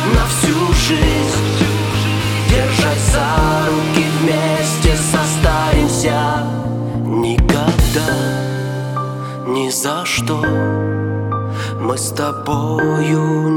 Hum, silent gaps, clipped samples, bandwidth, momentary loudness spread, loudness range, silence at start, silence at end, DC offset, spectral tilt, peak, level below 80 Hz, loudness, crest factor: none; none; under 0.1%; 18 kHz; 7 LU; 4 LU; 0 s; 0 s; under 0.1%; -5 dB/octave; 0 dBFS; -24 dBFS; -16 LUFS; 16 dB